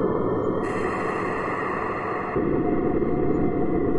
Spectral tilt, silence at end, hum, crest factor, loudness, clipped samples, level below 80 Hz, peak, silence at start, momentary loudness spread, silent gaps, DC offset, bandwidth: -8.5 dB/octave; 0 s; none; 14 dB; -25 LUFS; under 0.1%; -42 dBFS; -10 dBFS; 0 s; 3 LU; none; under 0.1%; 11 kHz